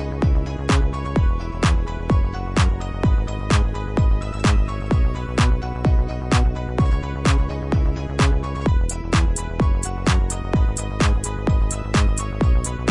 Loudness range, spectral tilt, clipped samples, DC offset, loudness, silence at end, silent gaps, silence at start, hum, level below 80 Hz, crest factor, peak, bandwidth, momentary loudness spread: 1 LU; -6 dB/octave; under 0.1%; under 0.1%; -21 LUFS; 0 s; none; 0 s; none; -22 dBFS; 14 dB; -4 dBFS; 11.5 kHz; 3 LU